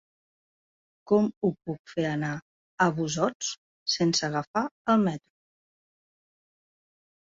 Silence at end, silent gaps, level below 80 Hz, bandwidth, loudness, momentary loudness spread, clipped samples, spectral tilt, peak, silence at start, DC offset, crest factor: 2.1 s; 1.37-1.41 s, 1.79-1.85 s, 2.42-2.78 s, 3.35-3.40 s, 3.58-3.86 s, 4.47-4.54 s, 4.71-4.85 s; -66 dBFS; 7.8 kHz; -27 LUFS; 10 LU; under 0.1%; -4.5 dB/octave; -10 dBFS; 1.05 s; under 0.1%; 20 dB